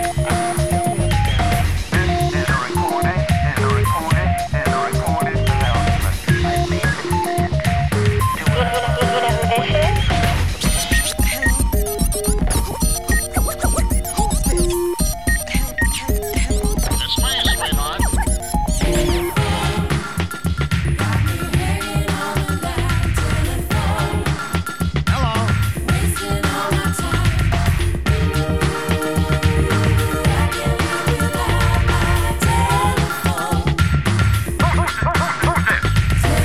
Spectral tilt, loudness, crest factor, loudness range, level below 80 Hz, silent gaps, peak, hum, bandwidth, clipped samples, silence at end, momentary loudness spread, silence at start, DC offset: -4.5 dB/octave; -18 LUFS; 16 dB; 2 LU; -24 dBFS; none; -2 dBFS; none; 16 kHz; under 0.1%; 0 s; 4 LU; 0 s; 1%